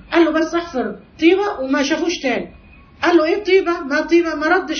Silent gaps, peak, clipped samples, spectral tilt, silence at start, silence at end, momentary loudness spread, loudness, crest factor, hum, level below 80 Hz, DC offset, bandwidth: none; -2 dBFS; under 0.1%; -4 dB/octave; 0.1 s; 0 s; 9 LU; -17 LUFS; 16 dB; none; -48 dBFS; under 0.1%; 6.6 kHz